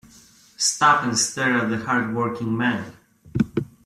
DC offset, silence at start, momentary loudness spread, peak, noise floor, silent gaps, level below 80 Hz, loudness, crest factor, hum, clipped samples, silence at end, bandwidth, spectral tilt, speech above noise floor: under 0.1%; 0.6 s; 8 LU; -4 dBFS; -51 dBFS; none; -54 dBFS; -21 LUFS; 18 dB; none; under 0.1%; 0.2 s; 14 kHz; -3.5 dB/octave; 30 dB